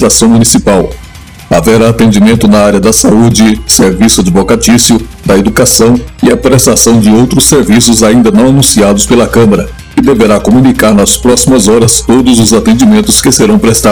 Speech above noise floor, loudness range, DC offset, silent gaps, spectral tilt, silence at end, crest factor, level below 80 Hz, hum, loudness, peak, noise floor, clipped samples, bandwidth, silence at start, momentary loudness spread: 23 dB; 1 LU; 1%; none; -4.5 dB/octave; 0 s; 4 dB; -24 dBFS; none; -5 LUFS; 0 dBFS; -28 dBFS; 20%; over 20 kHz; 0 s; 4 LU